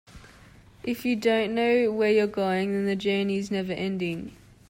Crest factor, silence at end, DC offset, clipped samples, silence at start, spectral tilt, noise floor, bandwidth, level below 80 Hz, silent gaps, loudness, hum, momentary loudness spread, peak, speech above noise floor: 14 dB; 0.35 s; under 0.1%; under 0.1%; 0.1 s; -6 dB/octave; -52 dBFS; 16 kHz; -58 dBFS; none; -26 LUFS; none; 10 LU; -12 dBFS; 27 dB